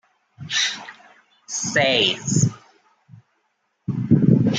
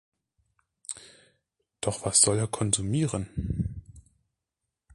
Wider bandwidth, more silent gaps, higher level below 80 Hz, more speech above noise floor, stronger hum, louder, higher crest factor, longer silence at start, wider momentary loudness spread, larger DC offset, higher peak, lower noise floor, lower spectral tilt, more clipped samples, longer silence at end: second, 9.6 kHz vs 11.5 kHz; neither; second, -56 dBFS vs -46 dBFS; second, 50 dB vs 59 dB; neither; first, -20 LUFS vs -26 LUFS; about the same, 20 dB vs 24 dB; second, 0.4 s vs 0.9 s; about the same, 18 LU vs 20 LU; neither; first, -2 dBFS vs -6 dBFS; second, -70 dBFS vs -86 dBFS; about the same, -4 dB/octave vs -4 dB/octave; neither; second, 0 s vs 0.95 s